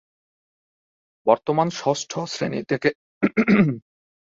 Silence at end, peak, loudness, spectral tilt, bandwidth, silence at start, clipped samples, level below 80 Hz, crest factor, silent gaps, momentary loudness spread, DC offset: 0.55 s; -2 dBFS; -22 LUFS; -6 dB/octave; 7.8 kHz; 1.25 s; under 0.1%; -60 dBFS; 22 dB; 2.95-3.21 s; 9 LU; under 0.1%